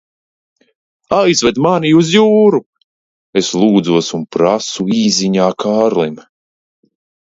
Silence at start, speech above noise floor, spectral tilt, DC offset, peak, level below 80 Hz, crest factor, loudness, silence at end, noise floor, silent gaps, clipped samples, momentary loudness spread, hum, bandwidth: 1.1 s; over 78 dB; -5 dB/octave; under 0.1%; 0 dBFS; -52 dBFS; 14 dB; -13 LUFS; 1.15 s; under -90 dBFS; 2.66-2.73 s, 2.84-3.33 s; under 0.1%; 8 LU; none; 7.8 kHz